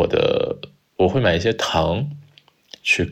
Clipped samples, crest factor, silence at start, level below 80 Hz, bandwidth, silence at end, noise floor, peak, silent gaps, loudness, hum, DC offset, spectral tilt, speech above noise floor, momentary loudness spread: under 0.1%; 16 dB; 0 s; -42 dBFS; 14.5 kHz; 0 s; -53 dBFS; -4 dBFS; none; -20 LUFS; none; under 0.1%; -5 dB/octave; 34 dB; 14 LU